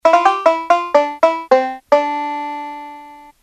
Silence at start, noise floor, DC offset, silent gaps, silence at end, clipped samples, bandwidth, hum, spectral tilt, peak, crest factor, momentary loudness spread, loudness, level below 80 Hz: 0.05 s; -38 dBFS; under 0.1%; none; 0.2 s; under 0.1%; 9.6 kHz; none; -2.5 dB/octave; 0 dBFS; 16 dB; 15 LU; -16 LUFS; -62 dBFS